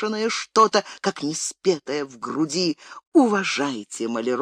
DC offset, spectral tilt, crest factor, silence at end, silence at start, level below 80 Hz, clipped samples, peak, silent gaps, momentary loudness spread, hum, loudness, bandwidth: under 0.1%; -3.5 dB/octave; 18 dB; 0 s; 0 s; -78 dBFS; under 0.1%; -4 dBFS; 3.07-3.12 s; 10 LU; none; -23 LUFS; 13.5 kHz